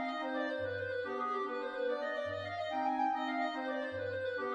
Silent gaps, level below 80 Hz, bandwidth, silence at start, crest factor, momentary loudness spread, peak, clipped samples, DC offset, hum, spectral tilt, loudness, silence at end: none; -76 dBFS; 9.4 kHz; 0 s; 14 dB; 4 LU; -24 dBFS; under 0.1%; under 0.1%; none; -6 dB/octave; -37 LUFS; 0 s